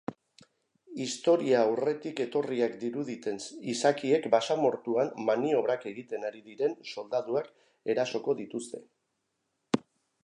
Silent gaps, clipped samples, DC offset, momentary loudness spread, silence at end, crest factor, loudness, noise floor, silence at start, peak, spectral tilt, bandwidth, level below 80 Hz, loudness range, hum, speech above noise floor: none; under 0.1%; under 0.1%; 13 LU; 0.45 s; 22 dB; -30 LUFS; -80 dBFS; 0.1 s; -8 dBFS; -4.5 dB/octave; 11 kHz; -80 dBFS; 5 LU; none; 51 dB